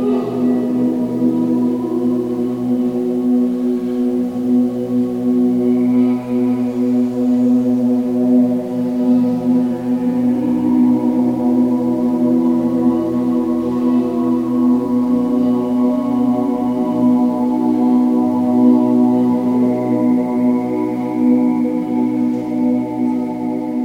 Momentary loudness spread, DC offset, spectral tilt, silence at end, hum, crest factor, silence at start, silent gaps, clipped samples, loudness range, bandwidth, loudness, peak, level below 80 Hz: 4 LU; under 0.1%; -9 dB/octave; 0 s; none; 14 dB; 0 s; none; under 0.1%; 3 LU; 5 kHz; -16 LUFS; -2 dBFS; -52 dBFS